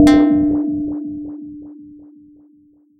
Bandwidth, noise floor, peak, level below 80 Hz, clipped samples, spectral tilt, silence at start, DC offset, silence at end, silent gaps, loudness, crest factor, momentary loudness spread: 9.6 kHz; -52 dBFS; 0 dBFS; -40 dBFS; under 0.1%; -6.5 dB/octave; 0 s; under 0.1%; 1.05 s; none; -17 LUFS; 18 dB; 24 LU